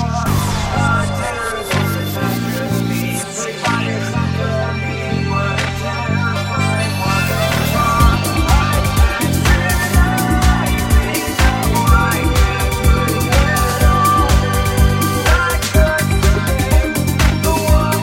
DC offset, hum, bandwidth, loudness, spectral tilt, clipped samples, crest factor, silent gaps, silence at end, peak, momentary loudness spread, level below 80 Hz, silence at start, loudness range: under 0.1%; none; 17 kHz; -15 LUFS; -5 dB/octave; under 0.1%; 14 dB; none; 0 s; 0 dBFS; 6 LU; -20 dBFS; 0 s; 5 LU